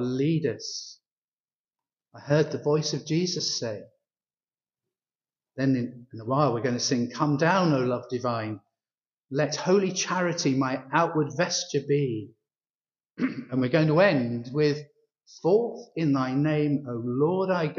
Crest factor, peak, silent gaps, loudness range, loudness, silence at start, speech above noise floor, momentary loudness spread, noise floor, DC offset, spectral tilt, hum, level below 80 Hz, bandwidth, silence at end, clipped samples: 20 dB; -8 dBFS; 1.12-1.32 s, 1.40-1.44 s, 1.55-1.64 s, 12.70-12.74 s; 4 LU; -26 LUFS; 0 s; over 64 dB; 11 LU; under -90 dBFS; under 0.1%; -5 dB/octave; none; -70 dBFS; 7.4 kHz; 0 s; under 0.1%